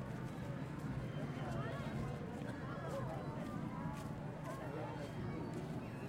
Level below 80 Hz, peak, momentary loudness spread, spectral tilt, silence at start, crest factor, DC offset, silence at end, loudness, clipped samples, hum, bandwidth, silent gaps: -60 dBFS; -32 dBFS; 3 LU; -7.5 dB/octave; 0 s; 12 dB; under 0.1%; 0 s; -45 LUFS; under 0.1%; none; 16 kHz; none